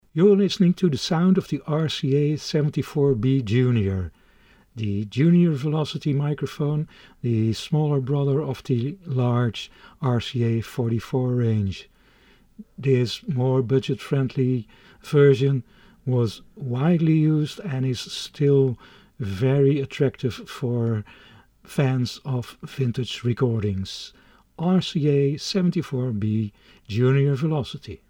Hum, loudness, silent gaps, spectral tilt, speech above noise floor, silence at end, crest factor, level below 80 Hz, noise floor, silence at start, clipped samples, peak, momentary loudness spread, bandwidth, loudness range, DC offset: none; -23 LUFS; none; -7.5 dB/octave; 34 dB; 0.15 s; 16 dB; -54 dBFS; -56 dBFS; 0.15 s; under 0.1%; -6 dBFS; 11 LU; 16 kHz; 4 LU; under 0.1%